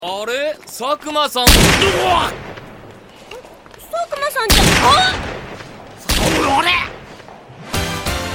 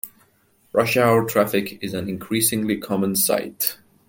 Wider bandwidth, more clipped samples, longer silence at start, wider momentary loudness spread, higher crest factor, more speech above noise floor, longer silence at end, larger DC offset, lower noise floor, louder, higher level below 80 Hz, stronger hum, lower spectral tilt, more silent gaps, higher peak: first, over 20 kHz vs 17 kHz; neither; about the same, 0 s vs 0.05 s; first, 25 LU vs 11 LU; about the same, 18 dB vs 20 dB; second, 25 dB vs 39 dB; second, 0 s vs 0.35 s; neither; second, -39 dBFS vs -60 dBFS; first, -15 LUFS vs -21 LUFS; first, -26 dBFS vs -60 dBFS; neither; about the same, -3 dB/octave vs -4 dB/octave; neither; about the same, 0 dBFS vs -2 dBFS